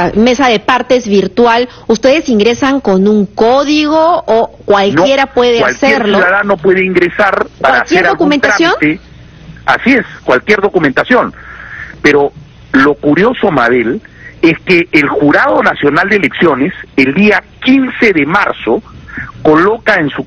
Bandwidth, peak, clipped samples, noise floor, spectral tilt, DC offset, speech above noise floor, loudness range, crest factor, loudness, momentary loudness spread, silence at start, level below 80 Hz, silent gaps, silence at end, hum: 8.4 kHz; 0 dBFS; 0.3%; -32 dBFS; -5.5 dB/octave; under 0.1%; 23 dB; 2 LU; 10 dB; -9 LUFS; 6 LU; 0 s; -40 dBFS; none; 0 s; none